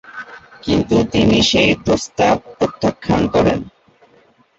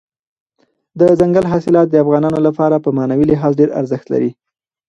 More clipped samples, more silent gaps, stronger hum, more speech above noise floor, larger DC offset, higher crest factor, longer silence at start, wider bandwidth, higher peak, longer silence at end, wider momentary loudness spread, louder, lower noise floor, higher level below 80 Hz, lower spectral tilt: neither; neither; neither; second, 37 dB vs 49 dB; neither; about the same, 14 dB vs 14 dB; second, 0.1 s vs 0.95 s; about the same, 8 kHz vs 8.6 kHz; about the same, -2 dBFS vs 0 dBFS; first, 0.9 s vs 0.55 s; first, 14 LU vs 7 LU; about the same, -16 LUFS vs -14 LUFS; second, -53 dBFS vs -62 dBFS; first, -38 dBFS vs -48 dBFS; second, -5 dB/octave vs -9.5 dB/octave